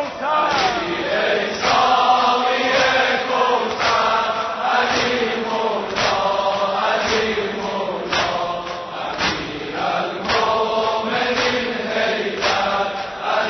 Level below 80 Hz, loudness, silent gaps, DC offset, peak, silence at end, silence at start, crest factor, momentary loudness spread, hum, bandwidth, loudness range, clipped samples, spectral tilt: -50 dBFS; -19 LUFS; none; under 0.1%; -4 dBFS; 0 s; 0 s; 14 dB; 8 LU; none; 6.4 kHz; 5 LU; under 0.1%; -3 dB/octave